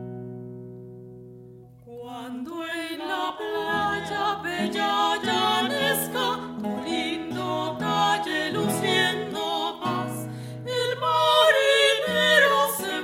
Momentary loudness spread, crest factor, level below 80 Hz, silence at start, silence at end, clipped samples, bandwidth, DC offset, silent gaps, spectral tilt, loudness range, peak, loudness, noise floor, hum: 20 LU; 20 dB; -62 dBFS; 0 s; 0 s; under 0.1%; 16 kHz; under 0.1%; none; -3.5 dB/octave; 10 LU; -6 dBFS; -23 LUFS; -47 dBFS; none